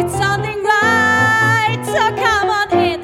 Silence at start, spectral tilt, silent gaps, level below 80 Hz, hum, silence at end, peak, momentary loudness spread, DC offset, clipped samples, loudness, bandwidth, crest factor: 0 s; -4.5 dB/octave; none; -42 dBFS; none; 0 s; -2 dBFS; 5 LU; under 0.1%; under 0.1%; -14 LUFS; 17 kHz; 14 dB